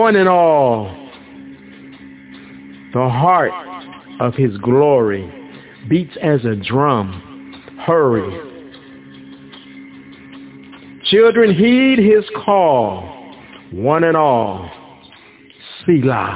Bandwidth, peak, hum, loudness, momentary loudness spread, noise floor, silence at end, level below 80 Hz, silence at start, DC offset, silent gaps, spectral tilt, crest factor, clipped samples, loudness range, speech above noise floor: 4 kHz; 0 dBFS; none; -14 LUFS; 26 LU; -44 dBFS; 0 s; -48 dBFS; 0 s; under 0.1%; none; -10.5 dB/octave; 16 dB; under 0.1%; 7 LU; 30 dB